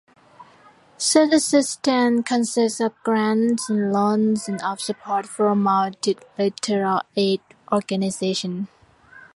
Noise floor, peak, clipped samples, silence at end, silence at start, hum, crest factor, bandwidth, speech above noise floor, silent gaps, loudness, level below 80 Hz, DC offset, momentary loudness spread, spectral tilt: -52 dBFS; -4 dBFS; under 0.1%; 0.1 s; 0.4 s; none; 18 dB; 11.5 kHz; 31 dB; none; -21 LUFS; -66 dBFS; under 0.1%; 8 LU; -4.5 dB/octave